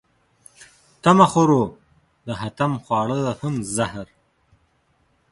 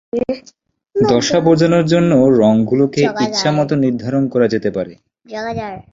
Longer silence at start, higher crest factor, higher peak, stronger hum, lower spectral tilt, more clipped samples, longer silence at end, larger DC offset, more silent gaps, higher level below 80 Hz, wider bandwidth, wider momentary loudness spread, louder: first, 1.05 s vs 0.15 s; first, 22 dB vs 14 dB; about the same, 0 dBFS vs -2 dBFS; neither; about the same, -6 dB/octave vs -6 dB/octave; neither; first, 1.3 s vs 0.1 s; neither; neither; about the same, -54 dBFS vs -50 dBFS; first, 11.5 kHz vs 7.8 kHz; first, 18 LU vs 13 LU; second, -20 LUFS vs -15 LUFS